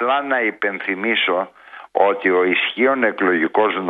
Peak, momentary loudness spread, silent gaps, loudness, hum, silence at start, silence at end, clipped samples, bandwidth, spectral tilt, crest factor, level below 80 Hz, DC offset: 0 dBFS; 6 LU; none; -18 LUFS; none; 0 s; 0 s; under 0.1%; 4.7 kHz; -7 dB/octave; 18 dB; -70 dBFS; under 0.1%